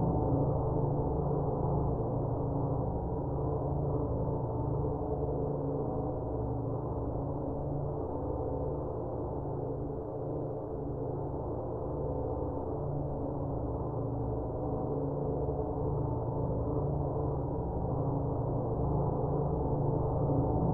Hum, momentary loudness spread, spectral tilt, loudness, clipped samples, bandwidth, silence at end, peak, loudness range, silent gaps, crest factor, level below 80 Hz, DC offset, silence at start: none; 5 LU; -14 dB/octave; -34 LUFS; under 0.1%; 1.8 kHz; 0 s; -18 dBFS; 4 LU; none; 16 dB; -42 dBFS; under 0.1%; 0 s